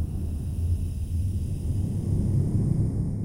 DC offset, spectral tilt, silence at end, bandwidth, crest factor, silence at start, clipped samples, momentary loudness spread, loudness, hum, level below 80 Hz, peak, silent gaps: under 0.1%; -9 dB/octave; 0 s; 16 kHz; 14 dB; 0 s; under 0.1%; 5 LU; -28 LUFS; none; -32 dBFS; -12 dBFS; none